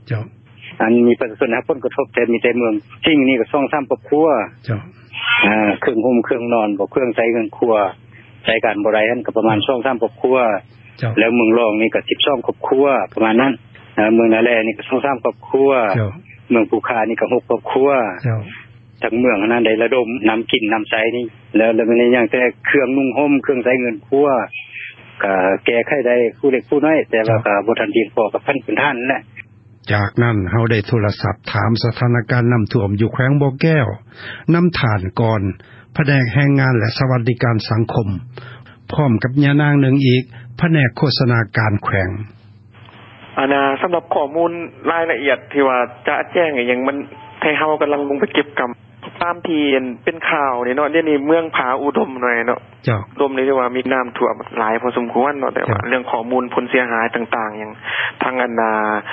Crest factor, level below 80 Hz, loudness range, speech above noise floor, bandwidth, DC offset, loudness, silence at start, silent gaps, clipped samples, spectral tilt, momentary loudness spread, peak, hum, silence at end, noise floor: 16 dB; -46 dBFS; 3 LU; 27 dB; 5.8 kHz; under 0.1%; -16 LUFS; 0.05 s; none; under 0.1%; -10.5 dB/octave; 9 LU; 0 dBFS; none; 0 s; -43 dBFS